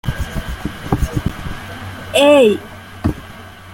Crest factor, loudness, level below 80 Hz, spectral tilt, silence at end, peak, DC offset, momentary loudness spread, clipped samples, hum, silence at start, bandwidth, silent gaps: 16 dB; -16 LUFS; -30 dBFS; -5.5 dB/octave; 0 s; 0 dBFS; under 0.1%; 21 LU; under 0.1%; none; 0.05 s; 17 kHz; none